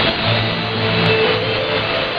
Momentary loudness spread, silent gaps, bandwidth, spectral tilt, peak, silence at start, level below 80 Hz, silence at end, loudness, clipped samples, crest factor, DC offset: 4 LU; none; 6.4 kHz; -7 dB/octave; 0 dBFS; 0 s; -42 dBFS; 0 s; -16 LUFS; under 0.1%; 18 dB; under 0.1%